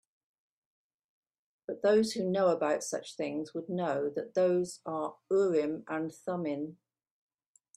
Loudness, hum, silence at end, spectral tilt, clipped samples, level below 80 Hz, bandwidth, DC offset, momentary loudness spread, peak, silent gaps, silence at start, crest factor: -32 LUFS; none; 1 s; -5.5 dB/octave; under 0.1%; -78 dBFS; 13 kHz; under 0.1%; 10 LU; -16 dBFS; none; 1.7 s; 18 dB